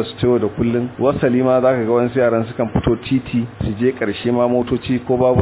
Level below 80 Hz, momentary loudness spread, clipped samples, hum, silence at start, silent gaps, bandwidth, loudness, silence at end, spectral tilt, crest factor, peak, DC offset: -38 dBFS; 5 LU; under 0.1%; none; 0 s; none; 4 kHz; -18 LUFS; 0 s; -11.5 dB/octave; 14 dB; -2 dBFS; under 0.1%